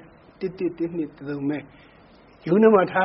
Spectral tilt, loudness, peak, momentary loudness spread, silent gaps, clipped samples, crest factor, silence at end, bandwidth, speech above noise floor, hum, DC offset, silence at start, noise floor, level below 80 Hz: -6 dB/octave; -23 LUFS; -4 dBFS; 17 LU; none; under 0.1%; 18 dB; 0 s; 5.8 kHz; 30 dB; none; under 0.1%; 0.4 s; -51 dBFS; -60 dBFS